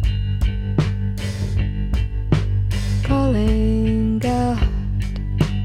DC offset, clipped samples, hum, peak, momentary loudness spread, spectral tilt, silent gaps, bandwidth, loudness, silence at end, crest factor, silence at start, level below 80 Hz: under 0.1%; under 0.1%; none; -4 dBFS; 6 LU; -7.5 dB/octave; none; 11.5 kHz; -21 LUFS; 0 s; 16 dB; 0 s; -24 dBFS